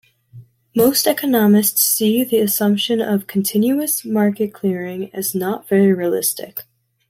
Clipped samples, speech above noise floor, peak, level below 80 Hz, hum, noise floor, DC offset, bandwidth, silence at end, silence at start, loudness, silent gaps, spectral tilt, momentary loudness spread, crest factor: under 0.1%; 26 dB; -2 dBFS; -62 dBFS; none; -43 dBFS; under 0.1%; 16.5 kHz; 0.5 s; 0.35 s; -17 LUFS; none; -4.5 dB/octave; 9 LU; 16 dB